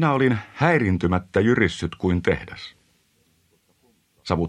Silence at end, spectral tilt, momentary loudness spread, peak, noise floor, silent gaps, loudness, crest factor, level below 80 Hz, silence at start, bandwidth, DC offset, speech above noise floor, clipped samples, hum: 0 s; -7 dB/octave; 18 LU; -2 dBFS; -64 dBFS; none; -22 LUFS; 20 dB; -46 dBFS; 0 s; 10.5 kHz; under 0.1%; 43 dB; under 0.1%; none